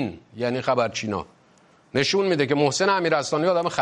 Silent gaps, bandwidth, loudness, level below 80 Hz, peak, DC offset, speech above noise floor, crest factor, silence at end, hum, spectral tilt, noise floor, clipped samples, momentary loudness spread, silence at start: none; 11 kHz; -23 LUFS; -64 dBFS; -6 dBFS; under 0.1%; 34 dB; 16 dB; 0 s; none; -4.5 dB/octave; -57 dBFS; under 0.1%; 10 LU; 0 s